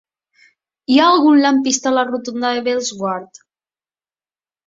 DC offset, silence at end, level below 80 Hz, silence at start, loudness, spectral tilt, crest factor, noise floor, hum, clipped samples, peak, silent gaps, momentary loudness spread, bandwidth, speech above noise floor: under 0.1%; 1.4 s; -64 dBFS; 0.9 s; -15 LUFS; -3 dB/octave; 16 dB; under -90 dBFS; none; under 0.1%; -2 dBFS; none; 12 LU; 7.8 kHz; over 75 dB